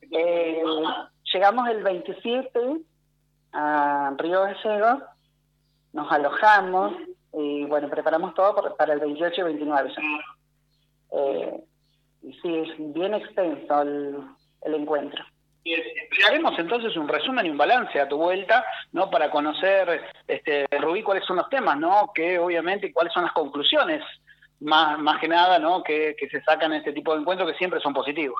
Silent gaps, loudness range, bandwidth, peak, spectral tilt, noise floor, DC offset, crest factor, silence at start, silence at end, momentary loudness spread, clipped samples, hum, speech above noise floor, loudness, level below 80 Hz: none; 6 LU; 7 kHz; -6 dBFS; -5 dB/octave; -68 dBFS; under 0.1%; 18 dB; 0.1 s; 0 s; 11 LU; under 0.1%; none; 45 dB; -23 LUFS; -72 dBFS